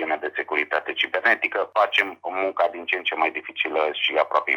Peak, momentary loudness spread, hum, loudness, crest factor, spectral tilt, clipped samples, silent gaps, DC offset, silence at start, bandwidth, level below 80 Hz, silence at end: -4 dBFS; 6 LU; none; -23 LUFS; 20 dB; -2.5 dB/octave; under 0.1%; none; under 0.1%; 0 s; 17 kHz; -76 dBFS; 0 s